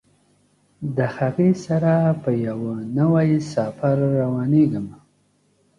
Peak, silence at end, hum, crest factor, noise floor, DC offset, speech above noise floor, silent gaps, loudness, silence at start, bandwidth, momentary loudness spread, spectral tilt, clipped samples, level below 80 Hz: -6 dBFS; 0.85 s; 50 Hz at -40 dBFS; 14 dB; -63 dBFS; under 0.1%; 43 dB; none; -21 LUFS; 0.8 s; 10 kHz; 9 LU; -9 dB/octave; under 0.1%; -58 dBFS